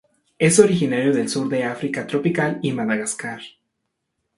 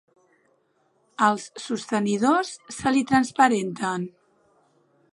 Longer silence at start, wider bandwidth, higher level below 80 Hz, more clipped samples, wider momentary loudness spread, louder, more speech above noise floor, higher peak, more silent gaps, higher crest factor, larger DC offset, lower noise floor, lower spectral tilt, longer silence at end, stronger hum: second, 0.4 s vs 1.2 s; about the same, 11.5 kHz vs 11.5 kHz; about the same, -60 dBFS vs -64 dBFS; neither; about the same, 11 LU vs 12 LU; first, -20 LUFS vs -23 LUFS; first, 57 dB vs 44 dB; first, 0 dBFS vs -4 dBFS; neither; about the same, 20 dB vs 22 dB; neither; first, -77 dBFS vs -67 dBFS; about the same, -5 dB/octave vs -4.5 dB/octave; second, 0.9 s vs 1.05 s; neither